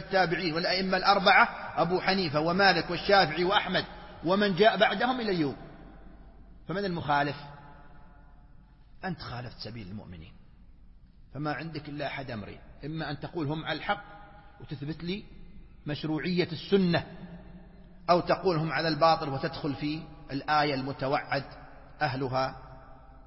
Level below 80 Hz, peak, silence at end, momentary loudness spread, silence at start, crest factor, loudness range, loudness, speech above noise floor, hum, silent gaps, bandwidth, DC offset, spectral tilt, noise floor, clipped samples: -52 dBFS; -8 dBFS; 0 s; 20 LU; 0 s; 22 dB; 14 LU; -28 LUFS; 25 dB; none; none; 6 kHz; under 0.1%; -8.5 dB/octave; -53 dBFS; under 0.1%